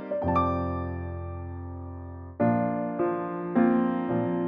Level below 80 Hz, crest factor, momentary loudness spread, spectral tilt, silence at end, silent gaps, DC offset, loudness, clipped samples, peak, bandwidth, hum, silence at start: -48 dBFS; 16 dB; 15 LU; -11 dB/octave; 0 s; none; under 0.1%; -28 LUFS; under 0.1%; -12 dBFS; 5.2 kHz; none; 0 s